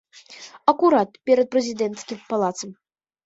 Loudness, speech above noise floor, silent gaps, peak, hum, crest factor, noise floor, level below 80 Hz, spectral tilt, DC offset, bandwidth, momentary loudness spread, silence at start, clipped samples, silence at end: -21 LUFS; 24 dB; none; -2 dBFS; none; 20 dB; -44 dBFS; -70 dBFS; -4.5 dB/octave; under 0.1%; 8 kHz; 17 LU; 0.3 s; under 0.1%; 0.5 s